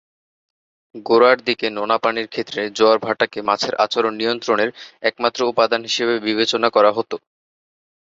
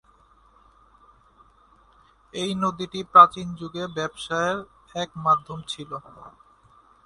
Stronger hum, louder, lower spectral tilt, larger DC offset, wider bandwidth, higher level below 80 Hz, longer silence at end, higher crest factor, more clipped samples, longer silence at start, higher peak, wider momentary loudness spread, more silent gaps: neither; first, -18 LUFS vs -23 LUFS; about the same, -3.5 dB/octave vs -4.5 dB/octave; neither; second, 7.8 kHz vs 11.5 kHz; about the same, -64 dBFS vs -60 dBFS; first, 0.9 s vs 0.75 s; second, 18 dB vs 26 dB; neither; second, 0.95 s vs 2.35 s; about the same, -2 dBFS vs 0 dBFS; second, 9 LU vs 20 LU; neither